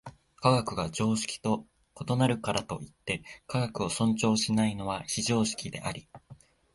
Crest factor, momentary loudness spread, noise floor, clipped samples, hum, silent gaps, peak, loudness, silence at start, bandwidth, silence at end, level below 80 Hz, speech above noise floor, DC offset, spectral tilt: 22 dB; 10 LU; -55 dBFS; under 0.1%; none; none; -8 dBFS; -30 LUFS; 0.05 s; 11.5 kHz; 0.4 s; -56 dBFS; 25 dB; under 0.1%; -5 dB/octave